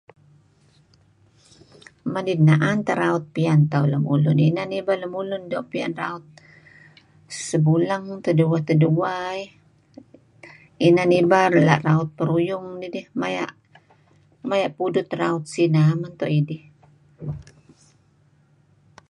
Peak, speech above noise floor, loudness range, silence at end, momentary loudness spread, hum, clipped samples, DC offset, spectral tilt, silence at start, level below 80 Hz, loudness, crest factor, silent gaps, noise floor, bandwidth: -2 dBFS; 39 dB; 6 LU; 1.7 s; 16 LU; none; under 0.1%; under 0.1%; -7 dB/octave; 2.05 s; -62 dBFS; -21 LUFS; 20 dB; none; -59 dBFS; 10.5 kHz